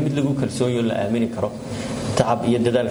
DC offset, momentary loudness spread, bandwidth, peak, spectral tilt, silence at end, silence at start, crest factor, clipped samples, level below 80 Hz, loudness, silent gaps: under 0.1%; 8 LU; over 20 kHz; -4 dBFS; -6.5 dB/octave; 0 s; 0 s; 18 dB; under 0.1%; -48 dBFS; -22 LUFS; none